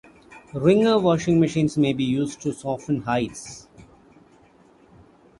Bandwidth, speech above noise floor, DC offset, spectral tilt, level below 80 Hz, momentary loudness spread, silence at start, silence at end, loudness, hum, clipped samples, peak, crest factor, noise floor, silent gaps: 11.5 kHz; 33 dB; under 0.1%; -6.5 dB/octave; -54 dBFS; 16 LU; 0.3 s; 1.6 s; -22 LUFS; none; under 0.1%; -4 dBFS; 18 dB; -54 dBFS; none